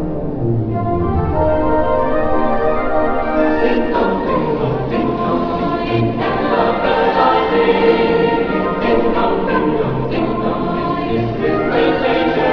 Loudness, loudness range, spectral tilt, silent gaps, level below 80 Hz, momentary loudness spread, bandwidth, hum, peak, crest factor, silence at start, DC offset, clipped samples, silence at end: -16 LUFS; 2 LU; -9 dB/octave; none; -30 dBFS; 5 LU; 5.4 kHz; none; -2 dBFS; 14 dB; 0 s; under 0.1%; under 0.1%; 0 s